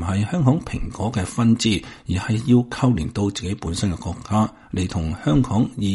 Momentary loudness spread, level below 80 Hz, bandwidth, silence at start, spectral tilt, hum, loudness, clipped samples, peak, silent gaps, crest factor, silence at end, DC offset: 8 LU; -38 dBFS; 11.5 kHz; 0 s; -6 dB/octave; none; -22 LUFS; under 0.1%; -4 dBFS; none; 16 dB; 0 s; under 0.1%